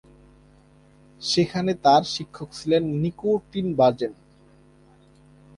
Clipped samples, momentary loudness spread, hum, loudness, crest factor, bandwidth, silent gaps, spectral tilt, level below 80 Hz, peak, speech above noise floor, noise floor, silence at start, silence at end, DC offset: under 0.1%; 13 LU; none; -23 LUFS; 20 dB; 11.5 kHz; none; -5.5 dB/octave; -58 dBFS; -6 dBFS; 32 dB; -54 dBFS; 1.2 s; 1.45 s; under 0.1%